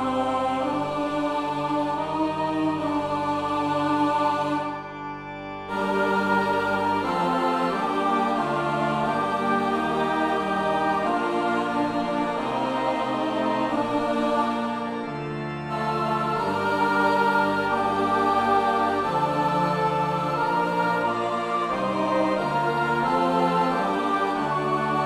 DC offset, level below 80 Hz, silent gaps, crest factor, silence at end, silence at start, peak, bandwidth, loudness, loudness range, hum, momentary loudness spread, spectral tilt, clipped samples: under 0.1%; -56 dBFS; none; 14 dB; 0 s; 0 s; -10 dBFS; 15 kHz; -24 LUFS; 3 LU; none; 5 LU; -6 dB/octave; under 0.1%